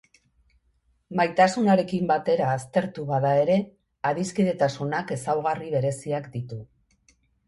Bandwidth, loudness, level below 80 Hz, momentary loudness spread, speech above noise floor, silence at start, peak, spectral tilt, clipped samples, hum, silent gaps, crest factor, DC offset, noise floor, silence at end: 11.5 kHz; -25 LUFS; -62 dBFS; 11 LU; 44 dB; 1.1 s; -6 dBFS; -6.5 dB/octave; under 0.1%; none; none; 20 dB; under 0.1%; -68 dBFS; 0.85 s